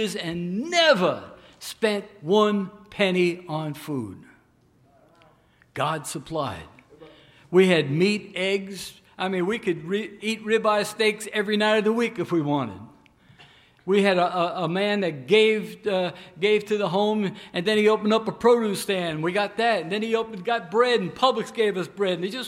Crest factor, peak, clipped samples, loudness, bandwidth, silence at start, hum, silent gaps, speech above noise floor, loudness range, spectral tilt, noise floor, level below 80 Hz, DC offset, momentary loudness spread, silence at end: 18 dB; -6 dBFS; under 0.1%; -23 LUFS; 16 kHz; 0 s; none; none; 37 dB; 6 LU; -5 dB/octave; -60 dBFS; -66 dBFS; under 0.1%; 11 LU; 0 s